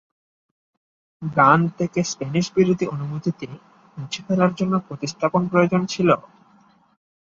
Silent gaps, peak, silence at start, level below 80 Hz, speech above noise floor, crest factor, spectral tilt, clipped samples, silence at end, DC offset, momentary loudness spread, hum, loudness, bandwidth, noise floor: none; -2 dBFS; 1.2 s; -60 dBFS; 35 dB; 20 dB; -6 dB/octave; under 0.1%; 1.1 s; under 0.1%; 15 LU; none; -21 LUFS; 7.6 kHz; -56 dBFS